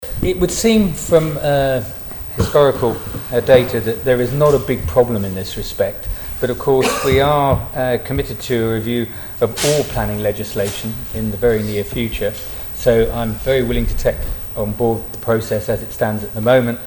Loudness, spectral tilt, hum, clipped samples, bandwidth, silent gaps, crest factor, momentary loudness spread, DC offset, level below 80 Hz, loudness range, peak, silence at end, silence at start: -17 LUFS; -5.5 dB/octave; none; under 0.1%; 19.5 kHz; none; 16 dB; 9 LU; under 0.1%; -30 dBFS; 3 LU; 0 dBFS; 0 s; 0 s